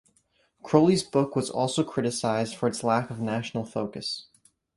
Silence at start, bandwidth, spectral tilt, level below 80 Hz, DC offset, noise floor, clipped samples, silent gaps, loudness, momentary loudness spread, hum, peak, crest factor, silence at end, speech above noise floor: 0.65 s; 11.5 kHz; -5.5 dB/octave; -64 dBFS; under 0.1%; -68 dBFS; under 0.1%; none; -27 LUFS; 10 LU; none; -4 dBFS; 22 dB; 0.55 s; 42 dB